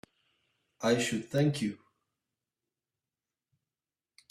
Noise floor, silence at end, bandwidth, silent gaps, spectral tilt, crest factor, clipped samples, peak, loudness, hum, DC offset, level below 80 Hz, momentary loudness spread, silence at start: under -90 dBFS; 2.55 s; 15 kHz; none; -5 dB/octave; 20 dB; under 0.1%; -16 dBFS; -31 LUFS; none; under 0.1%; -72 dBFS; 8 LU; 0.8 s